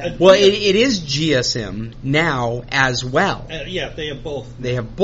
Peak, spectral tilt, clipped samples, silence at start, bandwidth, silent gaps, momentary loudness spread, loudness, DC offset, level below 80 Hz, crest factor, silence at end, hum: 0 dBFS; -3.5 dB/octave; under 0.1%; 0 s; 8 kHz; none; 15 LU; -17 LUFS; under 0.1%; -40 dBFS; 18 dB; 0 s; none